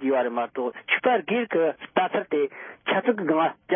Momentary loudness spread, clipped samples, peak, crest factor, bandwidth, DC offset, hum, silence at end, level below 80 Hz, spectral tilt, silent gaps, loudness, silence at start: 7 LU; under 0.1%; -8 dBFS; 18 dB; 3.7 kHz; under 0.1%; none; 0 s; -76 dBFS; -9.5 dB/octave; none; -25 LUFS; 0 s